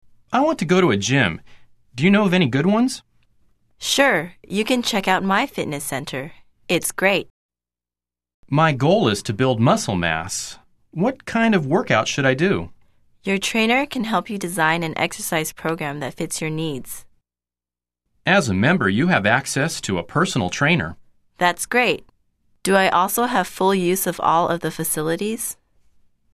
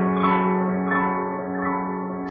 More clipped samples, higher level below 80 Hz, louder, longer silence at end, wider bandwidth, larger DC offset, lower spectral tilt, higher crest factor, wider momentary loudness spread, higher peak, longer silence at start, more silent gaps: neither; about the same, -54 dBFS vs -56 dBFS; first, -20 LUFS vs -23 LUFS; first, 0.8 s vs 0 s; first, 14 kHz vs 3.8 kHz; neither; second, -4.5 dB/octave vs -6.5 dB/octave; first, 20 dB vs 14 dB; first, 10 LU vs 7 LU; first, -2 dBFS vs -8 dBFS; first, 0.3 s vs 0 s; first, 7.30-7.49 s, 8.34-8.43 s vs none